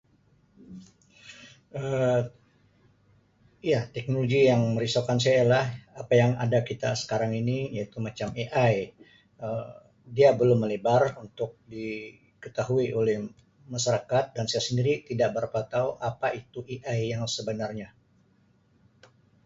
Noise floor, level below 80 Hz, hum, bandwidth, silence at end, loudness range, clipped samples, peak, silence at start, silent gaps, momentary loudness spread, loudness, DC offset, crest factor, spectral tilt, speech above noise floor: -64 dBFS; -62 dBFS; none; 8 kHz; 1.6 s; 8 LU; under 0.1%; -8 dBFS; 0.7 s; none; 17 LU; -27 LUFS; under 0.1%; 20 dB; -5.5 dB/octave; 38 dB